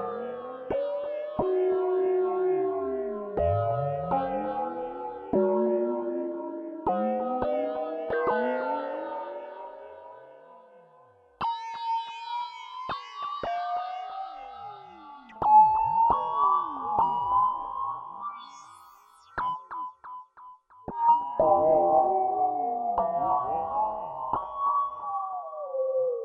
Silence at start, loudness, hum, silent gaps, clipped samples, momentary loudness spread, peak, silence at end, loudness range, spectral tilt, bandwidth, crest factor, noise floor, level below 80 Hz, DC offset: 0 s; -28 LUFS; none; none; under 0.1%; 16 LU; -10 dBFS; 0 s; 11 LU; -8 dB/octave; 7 kHz; 18 dB; -58 dBFS; -58 dBFS; under 0.1%